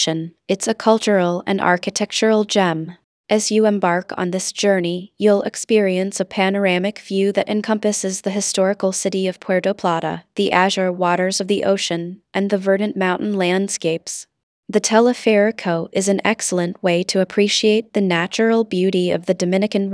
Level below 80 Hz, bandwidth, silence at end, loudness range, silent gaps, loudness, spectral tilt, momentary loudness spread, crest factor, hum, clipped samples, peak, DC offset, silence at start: -68 dBFS; 11 kHz; 0 s; 2 LU; 3.04-3.24 s, 14.43-14.63 s; -18 LUFS; -4 dB/octave; 7 LU; 18 dB; none; under 0.1%; 0 dBFS; under 0.1%; 0 s